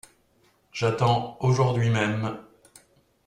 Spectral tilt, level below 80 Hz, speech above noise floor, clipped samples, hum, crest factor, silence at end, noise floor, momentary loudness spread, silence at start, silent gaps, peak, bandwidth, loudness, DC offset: -6.5 dB/octave; -56 dBFS; 41 dB; under 0.1%; none; 18 dB; 0.85 s; -64 dBFS; 12 LU; 0.75 s; none; -8 dBFS; 10.5 kHz; -24 LUFS; under 0.1%